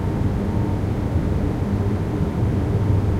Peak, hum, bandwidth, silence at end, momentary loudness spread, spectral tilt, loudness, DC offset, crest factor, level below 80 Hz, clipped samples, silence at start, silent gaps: -8 dBFS; none; 10 kHz; 0 s; 2 LU; -9 dB/octave; -22 LUFS; under 0.1%; 12 dB; -28 dBFS; under 0.1%; 0 s; none